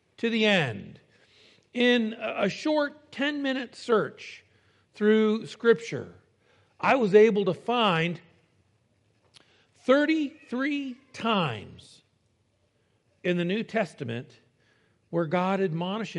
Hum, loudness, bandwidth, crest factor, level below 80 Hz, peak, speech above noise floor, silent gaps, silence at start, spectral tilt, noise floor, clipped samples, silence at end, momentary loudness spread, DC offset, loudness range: none; -26 LUFS; 10 kHz; 22 dB; -76 dBFS; -6 dBFS; 44 dB; none; 0.2 s; -6 dB/octave; -70 dBFS; under 0.1%; 0 s; 14 LU; under 0.1%; 7 LU